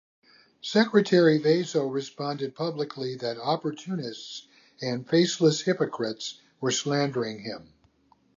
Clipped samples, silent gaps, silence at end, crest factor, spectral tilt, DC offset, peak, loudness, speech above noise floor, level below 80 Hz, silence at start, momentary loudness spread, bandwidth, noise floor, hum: under 0.1%; none; 0.75 s; 20 dB; -5 dB/octave; under 0.1%; -6 dBFS; -26 LUFS; 38 dB; -74 dBFS; 0.65 s; 16 LU; 7.6 kHz; -64 dBFS; none